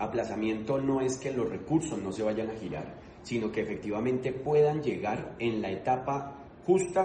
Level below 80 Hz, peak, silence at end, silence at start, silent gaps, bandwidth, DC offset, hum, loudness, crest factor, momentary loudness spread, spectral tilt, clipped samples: -58 dBFS; -14 dBFS; 0 s; 0 s; none; 9.6 kHz; under 0.1%; none; -31 LUFS; 16 dB; 10 LU; -6 dB/octave; under 0.1%